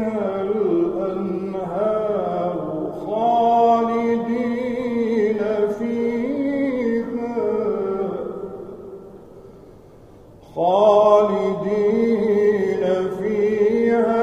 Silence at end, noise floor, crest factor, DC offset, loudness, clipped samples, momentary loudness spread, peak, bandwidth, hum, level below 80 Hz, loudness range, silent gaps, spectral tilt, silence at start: 0 s; -45 dBFS; 16 dB; under 0.1%; -20 LUFS; under 0.1%; 10 LU; -4 dBFS; 8.2 kHz; none; -54 dBFS; 7 LU; none; -7.5 dB/octave; 0 s